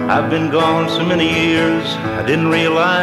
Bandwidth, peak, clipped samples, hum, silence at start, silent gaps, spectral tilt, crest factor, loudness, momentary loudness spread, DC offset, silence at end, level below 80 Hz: 13 kHz; -2 dBFS; under 0.1%; none; 0 s; none; -5.5 dB/octave; 14 dB; -15 LUFS; 4 LU; under 0.1%; 0 s; -46 dBFS